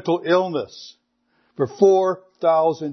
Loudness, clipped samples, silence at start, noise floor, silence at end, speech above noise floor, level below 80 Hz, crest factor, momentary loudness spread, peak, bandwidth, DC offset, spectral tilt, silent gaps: -19 LUFS; under 0.1%; 0.05 s; -66 dBFS; 0 s; 47 dB; -74 dBFS; 18 dB; 12 LU; -4 dBFS; 6.4 kHz; under 0.1%; -6.5 dB/octave; none